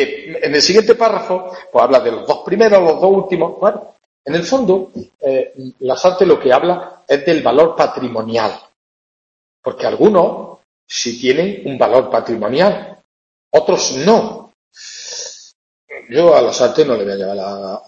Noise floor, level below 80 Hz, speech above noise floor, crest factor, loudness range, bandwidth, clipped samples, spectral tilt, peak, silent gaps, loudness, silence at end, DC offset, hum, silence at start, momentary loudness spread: under -90 dBFS; -56 dBFS; over 76 dB; 14 dB; 4 LU; 7.8 kHz; under 0.1%; -4.5 dB/octave; 0 dBFS; 4.06-4.24 s, 5.15-5.19 s, 8.76-9.63 s, 10.64-10.87 s, 13.04-13.51 s, 14.54-14.71 s, 15.55-15.88 s; -14 LUFS; 0.1 s; under 0.1%; none; 0 s; 16 LU